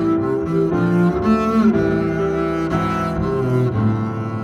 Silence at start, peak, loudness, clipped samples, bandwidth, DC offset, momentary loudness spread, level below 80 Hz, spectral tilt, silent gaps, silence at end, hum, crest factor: 0 s; -4 dBFS; -18 LUFS; under 0.1%; 12 kHz; under 0.1%; 5 LU; -38 dBFS; -8.5 dB/octave; none; 0 s; none; 12 dB